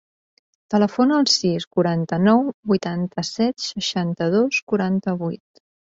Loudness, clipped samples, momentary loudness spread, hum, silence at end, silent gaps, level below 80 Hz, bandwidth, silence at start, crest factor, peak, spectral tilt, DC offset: -20 LUFS; under 0.1%; 8 LU; none; 0.6 s; 1.67-1.71 s, 2.54-2.63 s, 4.62-4.67 s; -60 dBFS; 8 kHz; 0.7 s; 18 dB; -4 dBFS; -5 dB/octave; under 0.1%